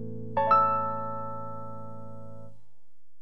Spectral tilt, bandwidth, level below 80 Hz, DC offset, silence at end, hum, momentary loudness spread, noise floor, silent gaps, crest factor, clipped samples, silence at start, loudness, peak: -8.5 dB/octave; 5.8 kHz; -68 dBFS; 1%; 0.7 s; none; 23 LU; -72 dBFS; none; 20 dB; under 0.1%; 0 s; -27 LUFS; -10 dBFS